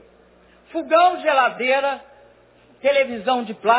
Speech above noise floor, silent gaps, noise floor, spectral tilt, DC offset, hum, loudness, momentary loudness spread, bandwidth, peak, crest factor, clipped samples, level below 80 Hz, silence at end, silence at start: 34 dB; none; -53 dBFS; -7 dB/octave; under 0.1%; 60 Hz at -60 dBFS; -19 LUFS; 12 LU; 4 kHz; -2 dBFS; 18 dB; under 0.1%; -64 dBFS; 0 s; 0.75 s